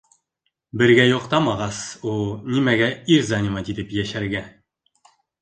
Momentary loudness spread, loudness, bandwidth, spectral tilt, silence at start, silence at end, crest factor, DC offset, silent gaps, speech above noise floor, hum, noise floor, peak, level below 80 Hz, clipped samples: 12 LU; -20 LUFS; 9.8 kHz; -5.5 dB/octave; 0.75 s; 0.9 s; 20 dB; under 0.1%; none; 56 dB; none; -76 dBFS; -2 dBFS; -50 dBFS; under 0.1%